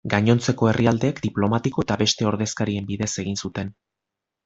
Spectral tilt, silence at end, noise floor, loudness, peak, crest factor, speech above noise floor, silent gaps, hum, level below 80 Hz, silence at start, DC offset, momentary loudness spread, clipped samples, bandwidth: -5 dB/octave; 0.75 s; -85 dBFS; -22 LUFS; -2 dBFS; 20 dB; 63 dB; none; none; -52 dBFS; 0.05 s; under 0.1%; 9 LU; under 0.1%; 8 kHz